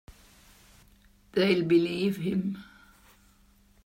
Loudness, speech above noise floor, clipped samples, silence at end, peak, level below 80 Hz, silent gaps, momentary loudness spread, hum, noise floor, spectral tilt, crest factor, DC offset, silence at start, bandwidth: -27 LUFS; 35 dB; under 0.1%; 1.2 s; -12 dBFS; -62 dBFS; none; 11 LU; none; -61 dBFS; -7 dB/octave; 20 dB; under 0.1%; 1.35 s; 16 kHz